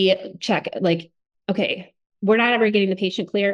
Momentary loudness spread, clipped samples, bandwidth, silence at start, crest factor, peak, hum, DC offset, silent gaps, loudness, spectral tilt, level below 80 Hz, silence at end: 10 LU; under 0.1%; 9.8 kHz; 0 s; 16 dB; -6 dBFS; none; under 0.1%; 2.06-2.10 s; -21 LUFS; -6 dB/octave; -70 dBFS; 0 s